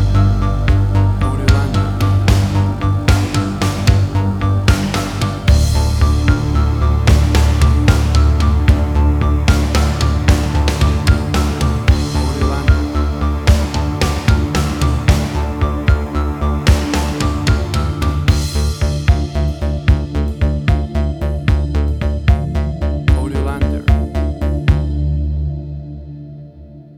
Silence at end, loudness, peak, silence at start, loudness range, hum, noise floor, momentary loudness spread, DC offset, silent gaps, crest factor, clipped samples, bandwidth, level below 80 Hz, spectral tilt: 0.05 s; -16 LUFS; 0 dBFS; 0 s; 4 LU; none; -36 dBFS; 6 LU; under 0.1%; none; 14 dB; under 0.1%; 14.5 kHz; -16 dBFS; -6 dB/octave